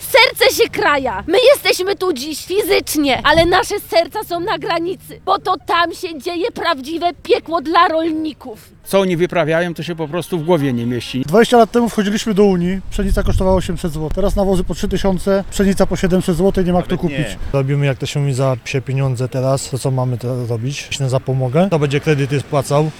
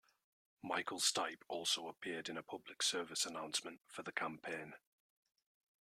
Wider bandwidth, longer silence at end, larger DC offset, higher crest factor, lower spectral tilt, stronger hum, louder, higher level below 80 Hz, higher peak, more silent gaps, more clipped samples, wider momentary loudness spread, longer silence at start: about the same, 17.5 kHz vs 16 kHz; second, 0 s vs 1.05 s; neither; second, 16 dB vs 24 dB; first, -5.5 dB/octave vs -1 dB/octave; neither; first, -16 LUFS vs -40 LUFS; first, -30 dBFS vs -88 dBFS; first, 0 dBFS vs -20 dBFS; neither; neither; second, 9 LU vs 14 LU; second, 0 s vs 0.65 s